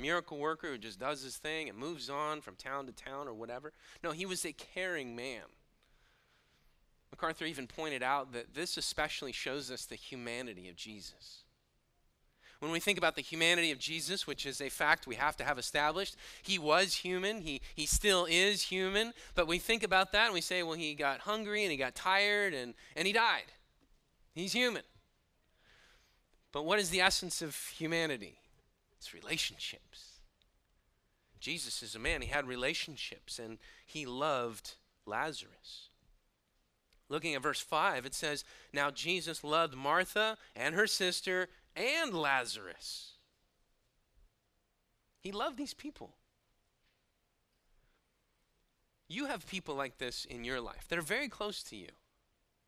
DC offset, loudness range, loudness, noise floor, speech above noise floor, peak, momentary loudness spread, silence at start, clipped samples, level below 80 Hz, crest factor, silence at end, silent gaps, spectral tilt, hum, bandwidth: under 0.1%; 12 LU; -35 LUFS; -79 dBFS; 43 dB; -10 dBFS; 16 LU; 0 s; under 0.1%; -58 dBFS; 28 dB; 0.75 s; none; -2.5 dB/octave; none; 15.5 kHz